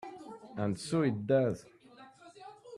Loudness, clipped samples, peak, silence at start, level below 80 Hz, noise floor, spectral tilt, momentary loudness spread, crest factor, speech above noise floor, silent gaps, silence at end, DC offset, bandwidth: -32 LUFS; under 0.1%; -16 dBFS; 0 s; -70 dBFS; -57 dBFS; -7 dB/octave; 23 LU; 20 dB; 26 dB; none; 0 s; under 0.1%; 12.5 kHz